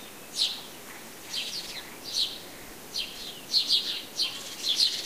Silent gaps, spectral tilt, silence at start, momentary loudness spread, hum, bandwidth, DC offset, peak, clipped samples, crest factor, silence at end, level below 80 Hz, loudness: none; 0.5 dB/octave; 0 s; 18 LU; none; 15.5 kHz; 0.2%; -10 dBFS; under 0.1%; 22 dB; 0 s; -64 dBFS; -28 LUFS